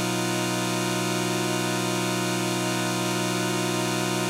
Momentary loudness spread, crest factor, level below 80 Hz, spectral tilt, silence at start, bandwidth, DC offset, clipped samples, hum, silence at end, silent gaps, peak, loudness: 0 LU; 14 dB; -66 dBFS; -4 dB/octave; 0 s; 16 kHz; under 0.1%; under 0.1%; none; 0 s; none; -12 dBFS; -25 LUFS